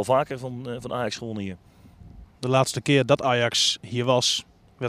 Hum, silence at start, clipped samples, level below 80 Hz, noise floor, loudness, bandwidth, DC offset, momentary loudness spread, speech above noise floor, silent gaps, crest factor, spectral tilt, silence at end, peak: none; 0 s; under 0.1%; -56 dBFS; -47 dBFS; -24 LUFS; 15 kHz; under 0.1%; 13 LU; 23 dB; none; 20 dB; -4 dB/octave; 0 s; -4 dBFS